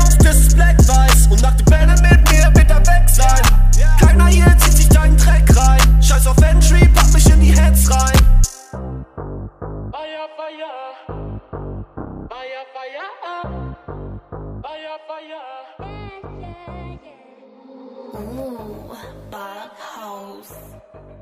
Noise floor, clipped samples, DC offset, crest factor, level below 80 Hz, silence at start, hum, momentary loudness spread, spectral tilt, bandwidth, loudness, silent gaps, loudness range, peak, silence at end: -45 dBFS; under 0.1%; under 0.1%; 12 dB; -14 dBFS; 0 s; none; 23 LU; -5 dB/octave; 16 kHz; -12 LUFS; none; 23 LU; 0 dBFS; 1.05 s